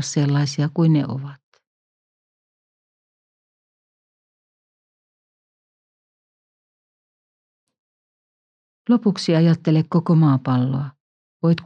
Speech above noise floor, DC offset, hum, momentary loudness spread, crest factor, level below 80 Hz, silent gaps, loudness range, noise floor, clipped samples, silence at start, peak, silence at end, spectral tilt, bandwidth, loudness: over 72 dB; under 0.1%; none; 12 LU; 18 dB; -76 dBFS; 1.43-1.52 s, 1.67-7.67 s, 7.79-8.85 s, 11.00-11.40 s; 10 LU; under -90 dBFS; under 0.1%; 0 s; -6 dBFS; 0 s; -7 dB/octave; 8.6 kHz; -19 LUFS